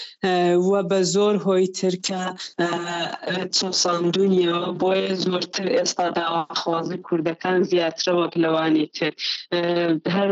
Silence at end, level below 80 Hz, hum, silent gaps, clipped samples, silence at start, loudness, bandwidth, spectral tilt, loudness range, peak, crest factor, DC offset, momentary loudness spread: 0 s; -72 dBFS; none; none; under 0.1%; 0 s; -22 LUFS; 8.2 kHz; -4.5 dB/octave; 1 LU; -10 dBFS; 10 dB; under 0.1%; 7 LU